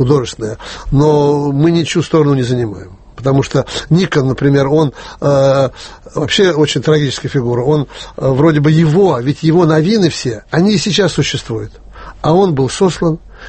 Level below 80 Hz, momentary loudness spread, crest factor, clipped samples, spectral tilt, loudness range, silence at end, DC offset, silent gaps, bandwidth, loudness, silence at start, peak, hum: -36 dBFS; 10 LU; 12 dB; under 0.1%; -6 dB/octave; 2 LU; 0 s; under 0.1%; none; 8.8 kHz; -13 LUFS; 0 s; 0 dBFS; none